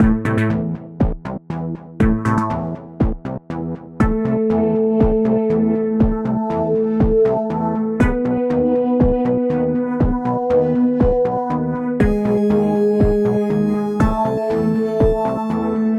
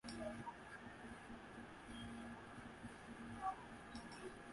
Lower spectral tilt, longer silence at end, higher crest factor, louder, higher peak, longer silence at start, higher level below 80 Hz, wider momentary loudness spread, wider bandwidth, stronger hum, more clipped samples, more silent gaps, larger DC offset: first, -9.5 dB/octave vs -5 dB/octave; about the same, 0 s vs 0 s; second, 14 dB vs 20 dB; first, -18 LUFS vs -53 LUFS; first, -4 dBFS vs -34 dBFS; about the same, 0 s vs 0.05 s; first, -28 dBFS vs -68 dBFS; about the same, 7 LU vs 8 LU; second, 9.2 kHz vs 11.5 kHz; neither; neither; neither; neither